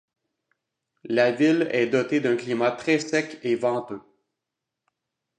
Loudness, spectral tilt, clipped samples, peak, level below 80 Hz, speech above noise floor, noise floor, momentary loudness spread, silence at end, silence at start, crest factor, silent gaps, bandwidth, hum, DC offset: -23 LUFS; -5.5 dB/octave; under 0.1%; -6 dBFS; -74 dBFS; 62 dB; -85 dBFS; 7 LU; 1.4 s; 1.05 s; 18 dB; none; 9.8 kHz; none; under 0.1%